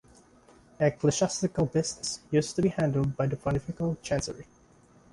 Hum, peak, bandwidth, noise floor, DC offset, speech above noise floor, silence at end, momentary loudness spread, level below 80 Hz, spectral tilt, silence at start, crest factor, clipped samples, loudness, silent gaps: none; -10 dBFS; 11.5 kHz; -59 dBFS; under 0.1%; 31 dB; 0.7 s; 6 LU; -52 dBFS; -5.5 dB/octave; 0.8 s; 18 dB; under 0.1%; -29 LUFS; none